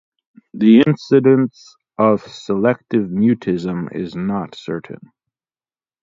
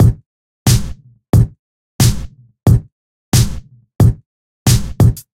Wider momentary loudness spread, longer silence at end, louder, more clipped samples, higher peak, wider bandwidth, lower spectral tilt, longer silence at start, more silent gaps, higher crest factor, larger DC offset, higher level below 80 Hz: about the same, 15 LU vs 15 LU; first, 1.05 s vs 0.15 s; about the same, -17 LUFS vs -15 LUFS; neither; about the same, 0 dBFS vs 0 dBFS; second, 7.4 kHz vs 16 kHz; first, -8 dB/octave vs -5.5 dB/octave; first, 0.55 s vs 0 s; second, none vs 0.26-0.66 s, 1.29-1.33 s, 1.59-1.99 s, 2.92-3.32 s, 4.26-4.66 s; about the same, 18 dB vs 14 dB; neither; second, -56 dBFS vs -24 dBFS